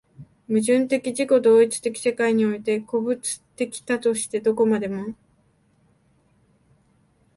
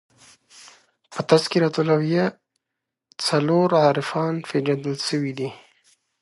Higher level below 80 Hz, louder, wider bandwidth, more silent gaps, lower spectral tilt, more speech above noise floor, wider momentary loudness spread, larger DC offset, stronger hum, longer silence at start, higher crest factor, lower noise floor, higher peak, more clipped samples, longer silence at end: about the same, -66 dBFS vs -70 dBFS; about the same, -22 LUFS vs -22 LUFS; about the same, 11.5 kHz vs 11.5 kHz; neither; about the same, -4.5 dB/octave vs -5.5 dB/octave; second, 41 dB vs 63 dB; about the same, 12 LU vs 10 LU; neither; neither; second, 0.2 s vs 1.1 s; about the same, 16 dB vs 20 dB; second, -62 dBFS vs -83 dBFS; second, -6 dBFS vs -2 dBFS; neither; first, 2.25 s vs 0.65 s